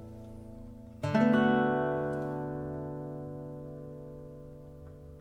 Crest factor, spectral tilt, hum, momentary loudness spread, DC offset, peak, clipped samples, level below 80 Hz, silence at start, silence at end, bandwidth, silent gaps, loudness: 18 dB; -8 dB/octave; none; 23 LU; under 0.1%; -14 dBFS; under 0.1%; -56 dBFS; 0 s; 0 s; 8.8 kHz; none; -31 LUFS